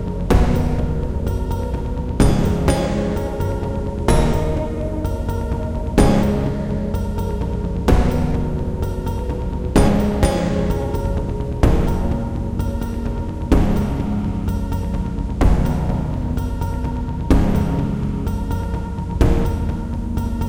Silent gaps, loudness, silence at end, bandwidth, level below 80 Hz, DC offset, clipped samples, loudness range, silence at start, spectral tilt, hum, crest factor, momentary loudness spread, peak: none; -21 LUFS; 0 s; 16.5 kHz; -22 dBFS; under 0.1%; under 0.1%; 2 LU; 0 s; -7.5 dB/octave; none; 18 dB; 7 LU; 0 dBFS